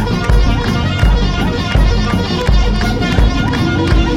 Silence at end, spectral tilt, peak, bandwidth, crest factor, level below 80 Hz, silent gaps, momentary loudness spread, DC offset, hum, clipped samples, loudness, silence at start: 0 s; -6 dB/octave; 0 dBFS; 11.5 kHz; 12 dB; -14 dBFS; none; 2 LU; under 0.1%; none; under 0.1%; -14 LUFS; 0 s